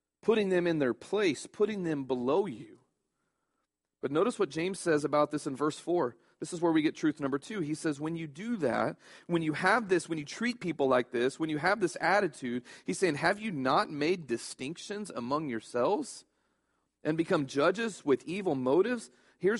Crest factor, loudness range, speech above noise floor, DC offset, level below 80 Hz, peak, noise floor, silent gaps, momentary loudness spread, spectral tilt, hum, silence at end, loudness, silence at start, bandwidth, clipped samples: 20 dB; 4 LU; 53 dB; under 0.1%; -72 dBFS; -10 dBFS; -84 dBFS; none; 10 LU; -5 dB/octave; none; 0 s; -31 LUFS; 0.25 s; 11.5 kHz; under 0.1%